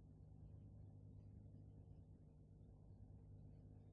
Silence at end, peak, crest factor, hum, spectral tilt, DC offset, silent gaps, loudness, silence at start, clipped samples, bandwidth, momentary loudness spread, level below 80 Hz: 0 s; -50 dBFS; 12 dB; 50 Hz at -75 dBFS; -12.5 dB/octave; under 0.1%; none; -64 LUFS; 0 s; under 0.1%; 2.6 kHz; 4 LU; -68 dBFS